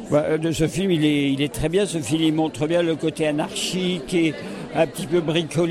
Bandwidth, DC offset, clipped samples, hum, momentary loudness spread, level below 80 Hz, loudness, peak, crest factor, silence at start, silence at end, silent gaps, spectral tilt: 15 kHz; under 0.1%; under 0.1%; none; 4 LU; -46 dBFS; -22 LUFS; -8 dBFS; 14 dB; 0 s; 0 s; none; -5.5 dB/octave